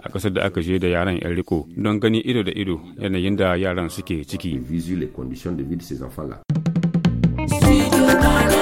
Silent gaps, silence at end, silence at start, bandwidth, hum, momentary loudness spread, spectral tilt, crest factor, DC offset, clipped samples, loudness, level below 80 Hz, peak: none; 0 s; 0.05 s; 16.5 kHz; none; 13 LU; -6 dB/octave; 18 dB; under 0.1%; under 0.1%; -21 LUFS; -32 dBFS; -2 dBFS